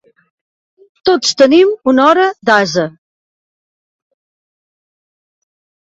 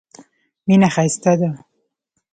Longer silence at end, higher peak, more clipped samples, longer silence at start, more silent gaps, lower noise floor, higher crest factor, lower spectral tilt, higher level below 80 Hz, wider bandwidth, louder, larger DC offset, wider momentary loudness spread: first, 2.95 s vs 0.75 s; about the same, 0 dBFS vs -2 dBFS; neither; first, 1.05 s vs 0.65 s; neither; first, under -90 dBFS vs -72 dBFS; about the same, 16 dB vs 16 dB; second, -3.5 dB/octave vs -6 dB/octave; about the same, -60 dBFS vs -58 dBFS; second, 8 kHz vs 9.4 kHz; first, -11 LUFS vs -17 LUFS; neither; second, 10 LU vs 13 LU